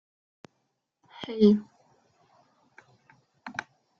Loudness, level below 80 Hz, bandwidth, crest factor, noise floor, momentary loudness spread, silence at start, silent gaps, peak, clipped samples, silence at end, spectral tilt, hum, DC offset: -26 LUFS; -72 dBFS; 6.6 kHz; 22 dB; -78 dBFS; 21 LU; 1.2 s; none; -8 dBFS; under 0.1%; 0.5 s; -7.5 dB/octave; none; under 0.1%